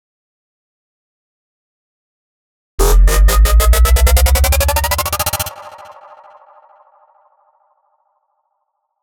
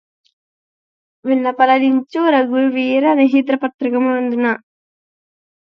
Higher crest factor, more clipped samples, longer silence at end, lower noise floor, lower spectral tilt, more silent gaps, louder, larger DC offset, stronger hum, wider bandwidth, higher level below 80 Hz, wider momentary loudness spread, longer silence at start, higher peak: about the same, 12 dB vs 14 dB; neither; first, 3.35 s vs 1.1 s; second, -70 dBFS vs under -90 dBFS; second, -3.5 dB/octave vs -6.5 dB/octave; second, none vs 3.74-3.79 s; about the same, -13 LUFS vs -15 LUFS; neither; neither; first, over 20 kHz vs 5.6 kHz; first, -16 dBFS vs -74 dBFS; first, 12 LU vs 6 LU; first, 2.8 s vs 1.25 s; about the same, -2 dBFS vs -2 dBFS